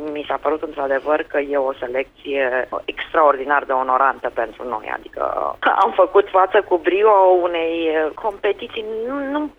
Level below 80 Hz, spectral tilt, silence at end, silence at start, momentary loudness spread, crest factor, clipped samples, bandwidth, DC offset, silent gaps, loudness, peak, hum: -54 dBFS; -5.5 dB/octave; 0.05 s; 0 s; 11 LU; 16 dB; under 0.1%; 5.8 kHz; under 0.1%; none; -19 LUFS; -2 dBFS; none